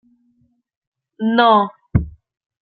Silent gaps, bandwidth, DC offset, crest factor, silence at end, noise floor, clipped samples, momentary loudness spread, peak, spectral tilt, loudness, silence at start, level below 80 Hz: none; 4.8 kHz; under 0.1%; 18 dB; 0.55 s; -62 dBFS; under 0.1%; 11 LU; -2 dBFS; -9.5 dB/octave; -17 LUFS; 1.2 s; -38 dBFS